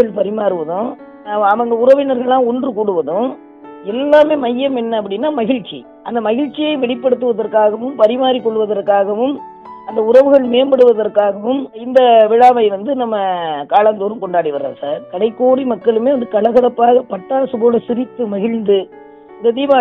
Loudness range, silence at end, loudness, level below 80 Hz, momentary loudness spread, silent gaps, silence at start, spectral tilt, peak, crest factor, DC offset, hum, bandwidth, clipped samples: 4 LU; 0 s; -14 LUFS; -60 dBFS; 11 LU; none; 0 s; -7 dB/octave; 0 dBFS; 14 dB; under 0.1%; none; 5.6 kHz; under 0.1%